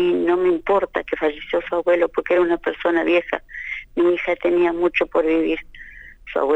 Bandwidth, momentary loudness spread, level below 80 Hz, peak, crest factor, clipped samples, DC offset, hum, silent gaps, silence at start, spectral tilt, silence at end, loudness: 5.8 kHz; 10 LU; -48 dBFS; -6 dBFS; 14 dB; under 0.1%; under 0.1%; none; none; 0 s; -6.5 dB/octave; 0 s; -20 LUFS